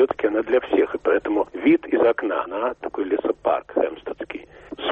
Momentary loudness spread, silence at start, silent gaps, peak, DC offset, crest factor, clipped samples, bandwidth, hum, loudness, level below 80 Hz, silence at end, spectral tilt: 13 LU; 0 s; none; -8 dBFS; under 0.1%; 14 dB; under 0.1%; 4.1 kHz; none; -22 LUFS; -56 dBFS; 0 s; -7 dB/octave